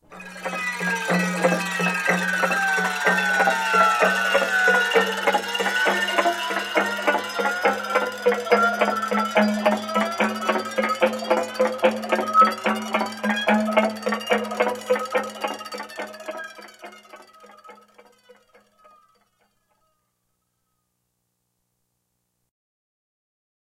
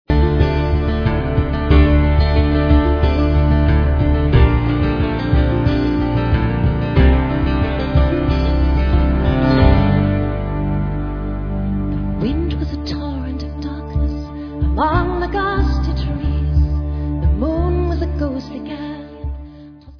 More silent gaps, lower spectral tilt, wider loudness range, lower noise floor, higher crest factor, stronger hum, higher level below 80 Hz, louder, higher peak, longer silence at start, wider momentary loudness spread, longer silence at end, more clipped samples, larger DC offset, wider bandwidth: neither; second, -3.5 dB/octave vs -9.5 dB/octave; first, 10 LU vs 7 LU; first, -75 dBFS vs -38 dBFS; about the same, 20 dB vs 16 dB; first, 60 Hz at -55 dBFS vs none; second, -72 dBFS vs -18 dBFS; second, -21 LUFS vs -17 LUFS; second, -4 dBFS vs 0 dBFS; about the same, 0.1 s vs 0.1 s; about the same, 12 LU vs 11 LU; first, 6.05 s vs 0.05 s; neither; neither; first, 16.5 kHz vs 5.4 kHz